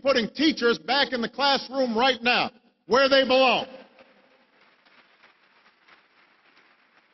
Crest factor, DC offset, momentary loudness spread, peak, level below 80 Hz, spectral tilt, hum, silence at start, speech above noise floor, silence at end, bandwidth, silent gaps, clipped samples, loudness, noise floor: 18 dB; under 0.1%; 7 LU; -8 dBFS; -66 dBFS; -4 dB/octave; none; 0.05 s; 38 dB; 3.3 s; 6.2 kHz; none; under 0.1%; -22 LUFS; -61 dBFS